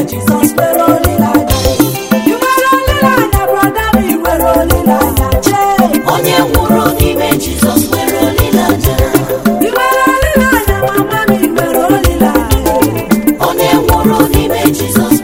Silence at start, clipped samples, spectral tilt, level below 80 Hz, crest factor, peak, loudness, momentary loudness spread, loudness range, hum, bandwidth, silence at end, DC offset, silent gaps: 0 s; 1%; -5 dB/octave; -22 dBFS; 10 dB; 0 dBFS; -10 LUFS; 3 LU; 1 LU; none; over 20 kHz; 0 s; under 0.1%; none